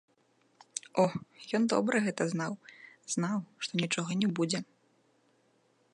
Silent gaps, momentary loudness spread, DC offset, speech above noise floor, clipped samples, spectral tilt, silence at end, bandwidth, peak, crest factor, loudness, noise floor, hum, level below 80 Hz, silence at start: none; 14 LU; under 0.1%; 39 dB; under 0.1%; -4.5 dB/octave; 1.3 s; 11 kHz; -14 dBFS; 20 dB; -32 LUFS; -70 dBFS; none; -78 dBFS; 0.75 s